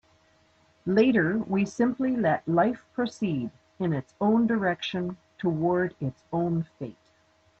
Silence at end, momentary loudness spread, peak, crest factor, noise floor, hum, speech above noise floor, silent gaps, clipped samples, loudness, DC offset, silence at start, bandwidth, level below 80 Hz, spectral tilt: 0.7 s; 12 LU; -10 dBFS; 18 dB; -64 dBFS; none; 38 dB; none; under 0.1%; -27 LUFS; under 0.1%; 0.85 s; 8.2 kHz; -64 dBFS; -7.5 dB/octave